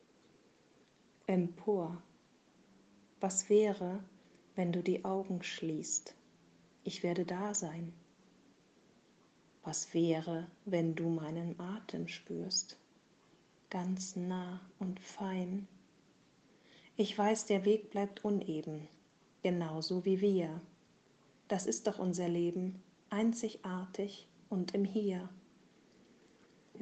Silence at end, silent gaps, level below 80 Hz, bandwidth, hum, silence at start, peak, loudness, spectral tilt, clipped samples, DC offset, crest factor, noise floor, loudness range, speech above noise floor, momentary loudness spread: 0 s; none; -80 dBFS; 8.8 kHz; none; 1.3 s; -18 dBFS; -37 LUFS; -5 dB/octave; under 0.1%; under 0.1%; 20 dB; -68 dBFS; 6 LU; 32 dB; 14 LU